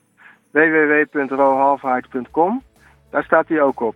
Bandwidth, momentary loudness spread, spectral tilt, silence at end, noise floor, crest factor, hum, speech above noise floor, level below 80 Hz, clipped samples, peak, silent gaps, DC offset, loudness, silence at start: 4.1 kHz; 10 LU; -8 dB/octave; 0.05 s; -50 dBFS; 18 dB; none; 33 dB; -58 dBFS; under 0.1%; 0 dBFS; none; under 0.1%; -17 LUFS; 0.55 s